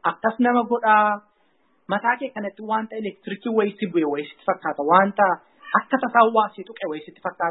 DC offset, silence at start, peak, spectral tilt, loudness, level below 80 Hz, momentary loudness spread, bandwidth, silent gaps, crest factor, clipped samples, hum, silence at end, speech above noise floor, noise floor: under 0.1%; 0.05 s; 0 dBFS; -10 dB/octave; -22 LUFS; -74 dBFS; 14 LU; 4.1 kHz; none; 22 dB; under 0.1%; none; 0 s; 43 dB; -65 dBFS